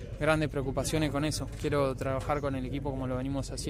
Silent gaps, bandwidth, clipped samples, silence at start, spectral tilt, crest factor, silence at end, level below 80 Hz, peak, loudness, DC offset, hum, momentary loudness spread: none; 16 kHz; under 0.1%; 0 s; -5.5 dB/octave; 18 dB; 0 s; -42 dBFS; -14 dBFS; -31 LUFS; under 0.1%; none; 6 LU